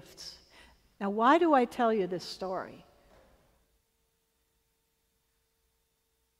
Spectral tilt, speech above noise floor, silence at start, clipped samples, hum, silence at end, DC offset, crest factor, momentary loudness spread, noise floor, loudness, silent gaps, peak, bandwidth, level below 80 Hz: -5.5 dB/octave; 49 dB; 0.2 s; under 0.1%; none; 3.65 s; under 0.1%; 22 dB; 22 LU; -77 dBFS; -28 LUFS; none; -10 dBFS; 15.5 kHz; -70 dBFS